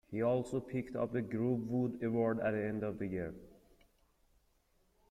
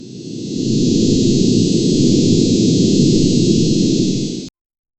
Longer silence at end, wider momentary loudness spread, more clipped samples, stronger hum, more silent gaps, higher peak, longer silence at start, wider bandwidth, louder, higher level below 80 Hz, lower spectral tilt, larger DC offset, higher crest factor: first, 1.55 s vs 0.5 s; second, 7 LU vs 12 LU; neither; neither; neither; second, -22 dBFS vs 0 dBFS; about the same, 0.1 s vs 0 s; first, 12 kHz vs 8.8 kHz; second, -37 LUFS vs -14 LUFS; second, -66 dBFS vs -36 dBFS; first, -8.5 dB/octave vs -6 dB/octave; neither; about the same, 16 dB vs 14 dB